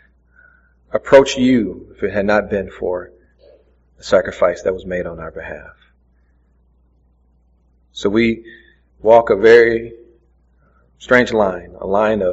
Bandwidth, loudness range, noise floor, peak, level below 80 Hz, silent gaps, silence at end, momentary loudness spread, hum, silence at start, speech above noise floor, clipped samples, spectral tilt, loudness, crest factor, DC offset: 8 kHz; 10 LU; -56 dBFS; 0 dBFS; -44 dBFS; none; 0 s; 18 LU; none; 0.95 s; 41 dB; under 0.1%; -4 dB/octave; -15 LUFS; 18 dB; under 0.1%